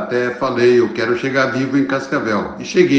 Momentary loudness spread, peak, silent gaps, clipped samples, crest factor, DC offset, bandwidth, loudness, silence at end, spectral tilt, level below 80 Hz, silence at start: 6 LU; 0 dBFS; none; under 0.1%; 16 dB; under 0.1%; 8 kHz; -17 LUFS; 0 s; -6 dB/octave; -54 dBFS; 0 s